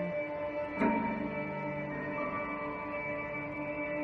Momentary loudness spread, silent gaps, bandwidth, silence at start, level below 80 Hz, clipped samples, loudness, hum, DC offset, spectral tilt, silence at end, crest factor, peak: 6 LU; none; 6.2 kHz; 0 s; -60 dBFS; under 0.1%; -35 LUFS; none; under 0.1%; -8.5 dB/octave; 0 s; 18 dB; -18 dBFS